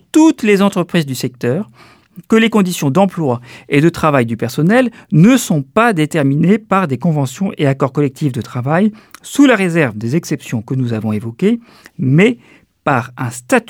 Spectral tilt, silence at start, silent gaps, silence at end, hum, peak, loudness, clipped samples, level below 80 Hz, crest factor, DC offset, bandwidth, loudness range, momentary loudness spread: -6.5 dB/octave; 0.15 s; none; 0.1 s; none; 0 dBFS; -14 LUFS; under 0.1%; -54 dBFS; 14 dB; under 0.1%; 17 kHz; 3 LU; 10 LU